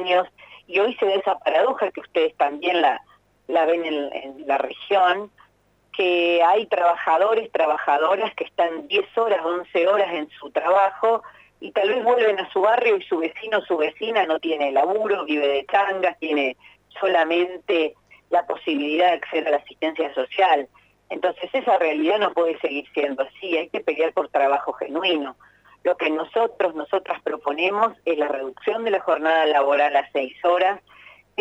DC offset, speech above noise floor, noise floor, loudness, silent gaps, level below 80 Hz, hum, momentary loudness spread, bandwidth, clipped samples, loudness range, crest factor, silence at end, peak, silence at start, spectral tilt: under 0.1%; 39 dB; -60 dBFS; -22 LUFS; none; -70 dBFS; 50 Hz at -70 dBFS; 8 LU; 8.6 kHz; under 0.1%; 3 LU; 16 dB; 0.6 s; -6 dBFS; 0 s; -4.5 dB/octave